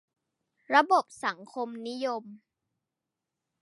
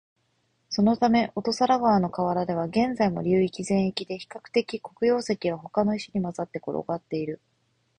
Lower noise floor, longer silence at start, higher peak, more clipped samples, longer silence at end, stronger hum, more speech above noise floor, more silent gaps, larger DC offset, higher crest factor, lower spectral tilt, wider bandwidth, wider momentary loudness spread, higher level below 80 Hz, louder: first, -87 dBFS vs -71 dBFS; about the same, 0.7 s vs 0.7 s; about the same, -8 dBFS vs -8 dBFS; neither; first, 1.25 s vs 0.65 s; neither; first, 59 dB vs 46 dB; neither; neither; first, 24 dB vs 18 dB; second, -3 dB/octave vs -6 dB/octave; first, 11.5 kHz vs 10 kHz; first, 14 LU vs 10 LU; second, -88 dBFS vs -60 dBFS; second, -29 LUFS vs -26 LUFS